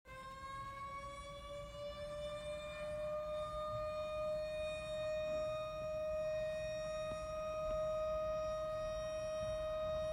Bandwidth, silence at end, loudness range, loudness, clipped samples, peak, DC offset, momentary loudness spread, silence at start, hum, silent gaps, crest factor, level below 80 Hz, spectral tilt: 15 kHz; 0 s; 4 LU; -42 LUFS; under 0.1%; -30 dBFS; under 0.1%; 8 LU; 0.05 s; none; none; 12 dB; -58 dBFS; -5 dB/octave